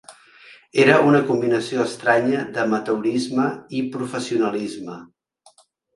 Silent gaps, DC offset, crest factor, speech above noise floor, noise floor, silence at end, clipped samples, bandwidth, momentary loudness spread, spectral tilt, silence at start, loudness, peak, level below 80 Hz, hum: none; under 0.1%; 20 dB; 36 dB; -56 dBFS; 0.9 s; under 0.1%; 11.5 kHz; 12 LU; -5.5 dB/octave; 0.1 s; -20 LUFS; 0 dBFS; -64 dBFS; none